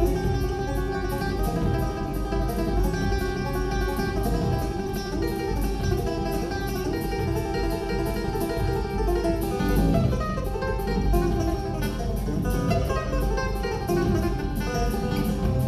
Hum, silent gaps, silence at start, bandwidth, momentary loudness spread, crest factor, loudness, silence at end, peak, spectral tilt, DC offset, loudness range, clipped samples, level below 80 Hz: none; none; 0 s; 14 kHz; 4 LU; 16 dB; -26 LUFS; 0 s; -10 dBFS; -6.5 dB/octave; under 0.1%; 2 LU; under 0.1%; -30 dBFS